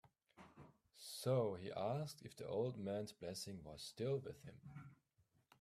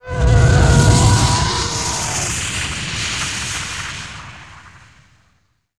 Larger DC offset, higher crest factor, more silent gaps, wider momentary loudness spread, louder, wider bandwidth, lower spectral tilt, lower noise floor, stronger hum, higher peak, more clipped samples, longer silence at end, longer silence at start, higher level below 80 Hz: second, under 0.1% vs 0.4%; about the same, 20 dB vs 16 dB; neither; first, 23 LU vs 16 LU; second, -45 LUFS vs -16 LUFS; first, 15.5 kHz vs 13.5 kHz; first, -6 dB/octave vs -4 dB/octave; first, -80 dBFS vs -62 dBFS; neither; second, -28 dBFS vs 0 dBFS; neither; second, 0.65 s vs 1.1 s; first, 0.35 s vs 0.05 s; second, -78 dBFS vs -24 dBFS